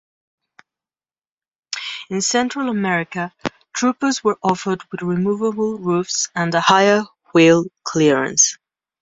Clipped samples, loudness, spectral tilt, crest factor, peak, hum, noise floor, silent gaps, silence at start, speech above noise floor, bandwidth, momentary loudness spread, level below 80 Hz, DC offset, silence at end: under 0.1%; -18 LUFS; -3.5 dB/octave; 20 dB; 0 dBFS; none; under -90 dBFS; none; 1.7 s; over 73 dB; 8.2 kHz; 13 LU; -60 dBFS; under 0.1%; 0.45 s